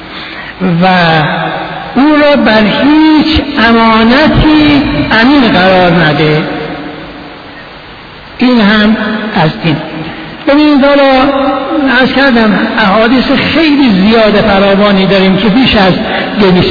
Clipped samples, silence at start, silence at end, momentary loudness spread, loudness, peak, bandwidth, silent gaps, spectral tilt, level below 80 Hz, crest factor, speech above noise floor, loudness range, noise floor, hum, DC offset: 0.6%; 0 s; 0 s; 14 LU; -7 LUFS; 0 dBFS; 5.4 kHz; none; -7.5 dB/octave; -28 dBFS; 8 dB; 22 dB; 5 LU; -28 dBFS; none; under 0.1%